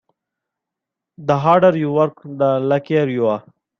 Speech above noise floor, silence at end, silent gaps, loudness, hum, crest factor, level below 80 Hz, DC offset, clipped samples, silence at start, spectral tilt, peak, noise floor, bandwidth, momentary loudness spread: 67 dB; 0.4 s; none; -17 LUFS; none; 16 dB; -60 dBFS; under 0.1%; under 0.1%; 1.2 s; -8.5 dB/octave; -2 dBFS; -84 dBFS; 6.8 kHz; 8 LU